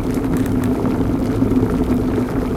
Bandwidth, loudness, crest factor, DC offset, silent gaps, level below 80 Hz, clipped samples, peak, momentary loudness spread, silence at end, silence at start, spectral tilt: 16 kHz; -18 LUFS; 14 dB; under 0.1%; none; -28 dBFS; under 0.1%; -2 dBFS; 2 LU; 0 s; 0 s; -8 dB/octave